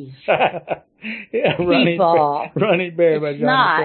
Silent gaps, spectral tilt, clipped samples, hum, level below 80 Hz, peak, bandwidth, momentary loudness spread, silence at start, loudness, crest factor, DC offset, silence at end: none; -11 dB/octave; under 0.1%; none; -56 dBFS; -4 dBFS; 4.4 kHz; 13 LU; 0 s; -17 LUFS; 14 dB; under 0.1%; 0 s